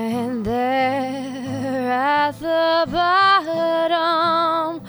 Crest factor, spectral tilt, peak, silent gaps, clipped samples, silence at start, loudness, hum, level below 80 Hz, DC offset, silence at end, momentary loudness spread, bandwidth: 14 dB; -5 dB/octave; -6 dBFS; none; under 0.1%; 0 s; -19 LUFS; none; -52 dBFS; under 0.1%; 0 s; 9 LU; over 20 kHz